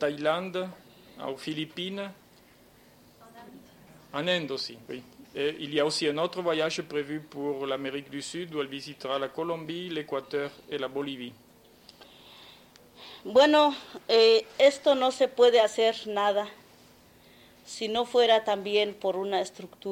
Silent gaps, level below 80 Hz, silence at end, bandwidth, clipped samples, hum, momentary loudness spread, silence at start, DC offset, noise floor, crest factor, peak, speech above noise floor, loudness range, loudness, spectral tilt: none; -70 dBFS; 0 s; 16.5 kHz; under 0.1%; none; 17 LU; 0 s; under 0.1%; -57 dBFS; 20 dB; -8 dBFS; 30 dB; 13 LU; -27 LUFS; -4 dB/octave